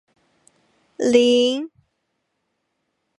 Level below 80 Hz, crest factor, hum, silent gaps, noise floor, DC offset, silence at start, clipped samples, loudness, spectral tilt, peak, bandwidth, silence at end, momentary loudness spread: -70 dBFS; 20 dB; none; none; -74 dBFS; under 0.1%; 1 s; under 0.1%; -18 LUFS; -3 dB/octave; -2 dBFS; 11 kHz; 1.5 s; 14 LU